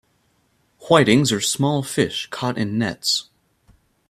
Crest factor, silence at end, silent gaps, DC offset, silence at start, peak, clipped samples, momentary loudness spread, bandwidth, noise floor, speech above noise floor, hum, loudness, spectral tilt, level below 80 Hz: 20 dB; 0.85 s; none; under 0.1%; 0.8 s; 0 dBFS; under 0.1%; 9 LU; 14.5 kHz; -64 dBFS; 45 dB; none; -19 LUFS; -4 dB/octave; -56 dBFS